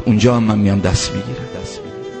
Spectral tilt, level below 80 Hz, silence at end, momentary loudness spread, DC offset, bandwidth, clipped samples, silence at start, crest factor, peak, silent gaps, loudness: -6 dB/octave; -34 dBFS; 0 s; 16 LU; under 0.1%; 8.8 kHz; under 0.1%; 0 s; 16 dB; 0 dBFS; none; -16 LUFS